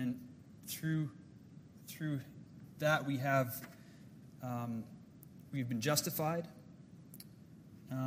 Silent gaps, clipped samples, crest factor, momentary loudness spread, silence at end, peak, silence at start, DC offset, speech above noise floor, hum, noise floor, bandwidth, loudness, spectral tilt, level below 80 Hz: none; under 0.1%; 22 dB; 23 LU; 0 s; -18 dBFS; 0 s; under 0.1%; 20 dB; none; -57 dBFS; 16 kHz; -38 LUFS; -5 dB/octave; -74 dBFS